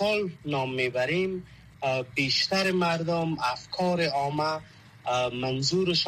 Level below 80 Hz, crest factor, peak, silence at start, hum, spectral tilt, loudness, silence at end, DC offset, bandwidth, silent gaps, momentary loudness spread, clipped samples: -60 dBFS; 14 dB; -14 dBFS; 0 s; none; -4.5 dB/octave; -27 LUFS; 0 s; under 0.1%; 14.5 kHz; none; 7 LU; under 0.1%